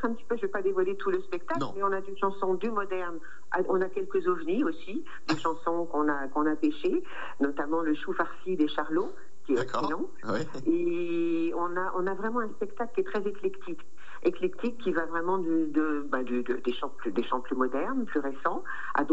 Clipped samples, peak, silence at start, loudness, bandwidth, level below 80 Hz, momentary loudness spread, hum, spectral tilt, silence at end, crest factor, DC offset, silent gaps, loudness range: under 0.1%; -12 dBFS; 0 s; -30 LUFS; 8 kHz; -68 dBFS; 6 LU; none; -6.5 dB/octave; 0 s; 18 dB; 3%; none; 2 LU